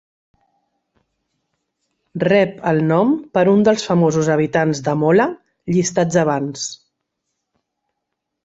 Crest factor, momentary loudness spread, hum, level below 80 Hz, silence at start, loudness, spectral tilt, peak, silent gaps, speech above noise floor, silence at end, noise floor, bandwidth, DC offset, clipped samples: 16 dB; 8 LU; none; -58 dBFS; 2.15 s; -17 LUFS; -6 dB/octave; -2 dBFS; none; 62 dB; 1.7 s; -78 dBFS; 8 kHz; under 0.1%; under 0.1%